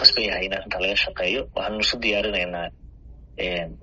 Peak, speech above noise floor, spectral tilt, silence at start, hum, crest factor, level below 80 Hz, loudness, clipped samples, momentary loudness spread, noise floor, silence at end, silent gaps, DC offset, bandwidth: 0 dBFS; 19 dB; 0 dB/octave; 0 s; none; 24 dB; -44 dBFS; -23 LUFS; under 0.1%; 9 LU; -44 dBFS; 0 s; none; under 0.1%; 8 kHz